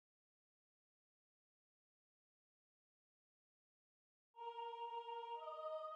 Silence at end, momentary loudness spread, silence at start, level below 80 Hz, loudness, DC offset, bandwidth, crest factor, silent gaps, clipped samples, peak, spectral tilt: 0 s; 6 LU; 4.35 s; under -90 dBFS; -50 LUFS; under 0.1%; 8.2 kHz; 18 dB; none; under 0.1%; -38 dBFS; 0.5 dB/octave